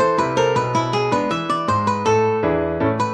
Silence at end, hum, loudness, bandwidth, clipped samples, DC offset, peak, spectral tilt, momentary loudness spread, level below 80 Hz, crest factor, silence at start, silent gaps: 0 s; none; -19 LUFS; 10.5 kHz; under 0.1%; under 0.1%; -4 dBFS; -6 dB/octave; 3 LU; -46 dBFS; 14 dB; 0 s; none